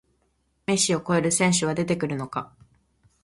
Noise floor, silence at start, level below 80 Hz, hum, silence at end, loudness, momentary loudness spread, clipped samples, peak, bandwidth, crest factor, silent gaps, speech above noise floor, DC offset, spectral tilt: -70 dBFS; 0.7 s; -58 dBFS; none; 0.8 s; -24 LUFS; 13 LU; under 0.1%; -8 dBFS; 11.5 kHz; 18 dB; none; 46 dB; under 0.1%; -4 dB/octave